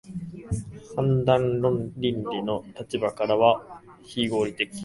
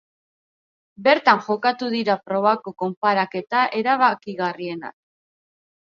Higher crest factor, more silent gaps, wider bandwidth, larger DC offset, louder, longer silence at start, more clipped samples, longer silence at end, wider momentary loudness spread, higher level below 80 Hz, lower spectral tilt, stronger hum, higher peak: about the same, 22 dB vs 22 dB; second, none vs 2.97-3.01 s; first, 11.5 kHz vs 7.2 kHz; neither; second, -26 LUFS vs -21 LUFS; second, 0.05 s vs 1 s; neither; second, 0 s vs 0.95 s; first, 14 LU vs 11 LU; first, -50 dBFS vs -74 dBFS; about the same, -6.5 dB/octave vs -6 dB/octave; neither; second, -4 dBFS vs 0 dBFS